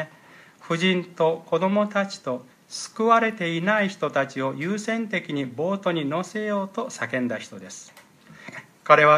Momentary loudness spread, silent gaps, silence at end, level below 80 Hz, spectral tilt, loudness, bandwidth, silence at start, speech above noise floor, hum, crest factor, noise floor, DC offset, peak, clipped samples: 17 LU; none; 0 s; -76 dBFS; -5 dB/octave; -24 LUFS; 14 kHz; 0 s; 27 dB; none; 22 dB; -51 dBFS; under 0.1%; -2 dBFS; under 0.1%